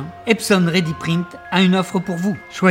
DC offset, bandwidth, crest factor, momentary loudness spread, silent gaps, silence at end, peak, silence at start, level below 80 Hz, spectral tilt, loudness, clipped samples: under 0.1%; 16.5 kHz; 18 dB; 7 LU; none; 0 s; 0 dBFS; 0 s; -54 dBFS; -5.5 dB/octave; -18 LUFS; under 0.1%